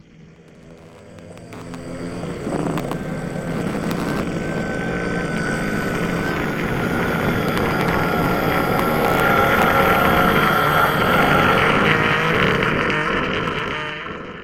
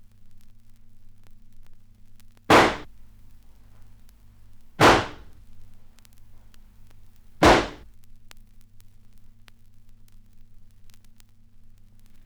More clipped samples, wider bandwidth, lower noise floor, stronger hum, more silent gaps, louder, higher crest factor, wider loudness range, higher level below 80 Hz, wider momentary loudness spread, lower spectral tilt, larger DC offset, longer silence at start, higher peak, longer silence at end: neither; second, 17 kHz vs over 20 kHz; about the same, -45 dBFS vs -48 dBFS; neither; neither; about the same, -19 LUFS vs -19 LUFS; about the same, 20 dB vs 24 dB; first, 11 LU vs 3 LU; first, -38 dBFS vs -44 dBFS; second, 12 LU vs 18 LU; about the same, -5.5 dB/octave vs -4.5 dB/octave; neither; about the same, 0.2 s vs 0.25 s; first, 0 dBFS vs -4 dBFS; second, 0 s vs 4.55 s